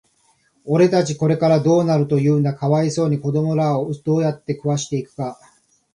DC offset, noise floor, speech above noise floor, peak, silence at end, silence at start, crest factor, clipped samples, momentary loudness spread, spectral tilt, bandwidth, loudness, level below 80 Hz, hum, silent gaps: under 0.1%; -61 dBFS; 43 dB; -4 dBFS; 0.6 s; 0.65 s; 16 dB; under 0.1%; 10 LU; -7 dB/octave; 11 kHz; -19 LUFS; -60 dBFS; none; none